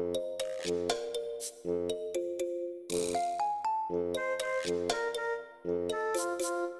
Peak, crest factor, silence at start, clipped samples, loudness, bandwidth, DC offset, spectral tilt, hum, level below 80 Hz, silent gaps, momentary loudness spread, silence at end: -14 dBFS; 20 dB; 0 s; under 0.1%; -34 LUFS; 13.5 kHz; under 0.1%; -3.5 dB/octave; none; -66 dBFS; none; 5 LU; 0 s